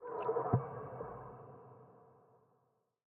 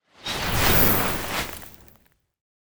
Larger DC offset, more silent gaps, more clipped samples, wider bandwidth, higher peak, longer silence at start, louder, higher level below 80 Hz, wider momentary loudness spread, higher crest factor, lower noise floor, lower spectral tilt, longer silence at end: neither; neither; neither; second, 3.2 kHz vs over 20 kHz; second, -18 dBFS vs -4 dBFS; about the same, 0 s vs 0 s; second, -39 LUFS vs -20 LUFS; second, -70 dBFS vs -36 dBFS; first, 24 LU vs 18 LU; about the same, 24 dB vs 20 dB; first, -78 dBFS vs -59 dBFS; first, -6.5 dB/octave vs -3.5 dB/octave; first, 0.95 s vs 0.2 s